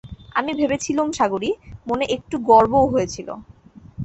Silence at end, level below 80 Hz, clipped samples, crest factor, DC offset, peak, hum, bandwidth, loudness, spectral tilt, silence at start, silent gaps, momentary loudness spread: 0 s; -46 dBFS; under 0.1%; 18 dB; under 0.1%; -2 dBFS; none; 8.4 kHz; -20 LUFS; -5 dB/octave; 0.05 s; none; 15 LU